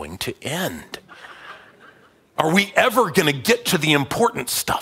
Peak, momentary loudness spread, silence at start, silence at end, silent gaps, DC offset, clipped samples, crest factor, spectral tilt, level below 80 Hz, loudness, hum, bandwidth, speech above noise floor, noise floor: 0 dBFS; 21 LU; 0 s; 0 s; none; under 0.1%; under 0.1%; 20 dB; -3.5 dB/octave; -54 dBFS; -19 LUFS; none; 16.5 kHz; 32 dB; -52 dBFS